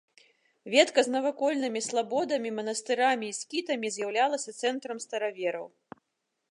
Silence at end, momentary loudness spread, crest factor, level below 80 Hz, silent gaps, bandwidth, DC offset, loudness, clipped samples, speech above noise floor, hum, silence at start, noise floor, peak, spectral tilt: 0.85 s; 9 LU; 22 dB; -86 dBFS; none; 11.5 kHz; under 0.1%; -29 LUFS; under 0.1%; 53 dB; none; 0.65 s; -82 dBFS; -8 dBFS; -2 dB/octave